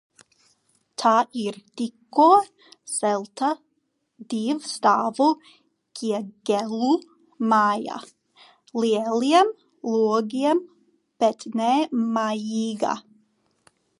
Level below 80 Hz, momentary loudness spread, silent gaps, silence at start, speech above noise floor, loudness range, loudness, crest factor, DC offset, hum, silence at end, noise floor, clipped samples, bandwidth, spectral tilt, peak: -80 dBFS; 13 LU; none; 1 s; 51 dB; 3 LU; -23 LUFS; 20 dB; under 0.1%; none; 1 s; -73 dBFS; under 0.1%; 11.5 kHz; -4.5 dB/octave; -4 dBFS